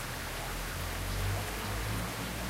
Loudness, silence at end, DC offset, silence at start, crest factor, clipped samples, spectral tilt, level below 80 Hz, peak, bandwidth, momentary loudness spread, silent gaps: -36 LUFS; 0 s; under 0.1%; 0 s; 14 dB; under 0.1%; -4 dB/octave; -42 dBFS; -22 dBFS; 16 kHz; 3 LU; none